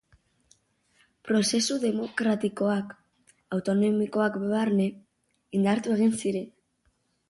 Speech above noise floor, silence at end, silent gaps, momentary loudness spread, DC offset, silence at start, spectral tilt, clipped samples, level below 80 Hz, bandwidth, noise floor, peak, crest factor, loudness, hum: 46 dB; 0.8 s; none; 8 LU; under 0.1%; 1.25 s; -5 dB/octave; under 0.1%; -68 dBFS; 11.5 kHz; -71 dBFS; -12 dBFS; 16 dB; -27 LUFS; none